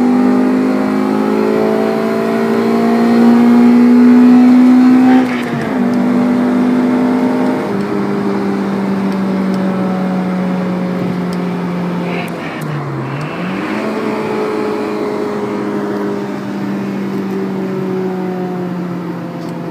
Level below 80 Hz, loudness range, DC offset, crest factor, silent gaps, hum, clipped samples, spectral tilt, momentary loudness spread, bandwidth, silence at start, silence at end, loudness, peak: -54 dBFS; 10 LU; under 0.1%; 12 dB; none; none; under 0.1%; -7.5 dB/octave; 13 LU; 10.5 kHz; 0 s; 0 s; -13 LUFS; 0 dBFS